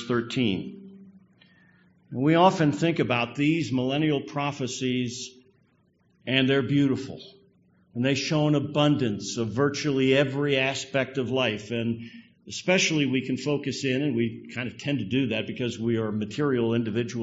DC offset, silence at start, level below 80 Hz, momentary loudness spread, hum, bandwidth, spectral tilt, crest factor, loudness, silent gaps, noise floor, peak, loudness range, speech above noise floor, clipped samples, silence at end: under 0.1%; 0 s; -64 dBFS; 11 LU; none; 8 kHz; -4.5 dB/octave; 20 dB; -25 LUFS; none; -65 dBFS; -6 dBFS; 3 LU; 40 dB; under 0.1%; 0 s